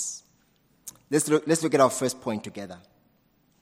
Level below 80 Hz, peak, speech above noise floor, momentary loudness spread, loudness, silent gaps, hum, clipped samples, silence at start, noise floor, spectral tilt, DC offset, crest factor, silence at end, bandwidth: -72 dBFS; -6 dBFS; 41 dB; 22 LU; -25 LUFS; none; none; under 0.1%; 0 s; -66 dBFS; -4 dB/octave; under 0.1%; 22 dB; 0.85 s; 16 kHz